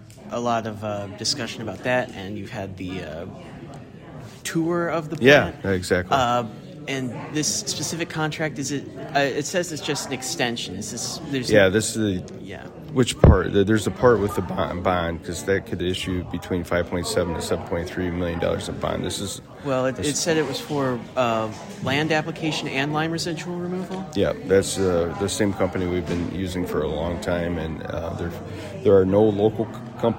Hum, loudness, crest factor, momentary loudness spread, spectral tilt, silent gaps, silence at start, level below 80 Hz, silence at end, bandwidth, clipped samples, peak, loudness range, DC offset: none; -23 LUFS; 24 dB; 13 LU; -4.5 dB/octave; none; 0 s; -38 dBFS; 0 s; 16.5 kHz; under 0.1%; 0 dBFS; 6 LU; under 0.1%